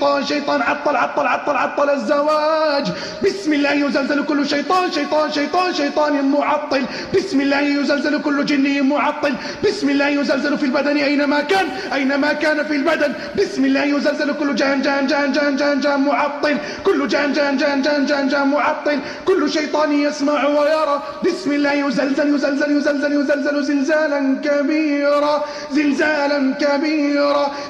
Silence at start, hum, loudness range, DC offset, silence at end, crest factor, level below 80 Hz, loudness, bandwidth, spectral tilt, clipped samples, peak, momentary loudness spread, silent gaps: 0 s; none; 1 LU; under 0.1%; 0 s; 12 dB; -58 dBFS; -18 LUFS; 9.4 kHz; -4 dB/octave; under 0.1%; -6 dBFS; 4 LU; none